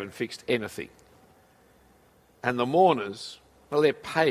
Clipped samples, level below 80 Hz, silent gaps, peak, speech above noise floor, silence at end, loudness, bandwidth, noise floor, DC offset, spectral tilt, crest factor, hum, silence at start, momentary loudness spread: under 0.1%; -64 dBFS; none; -8 dBFS; 34 dB; 0 s; -26 LUFS; 15.5 kHz; -60 dBFS; under 0.1%; -5.5 dB/octave; 20 dB; none; 0 s; 18 LU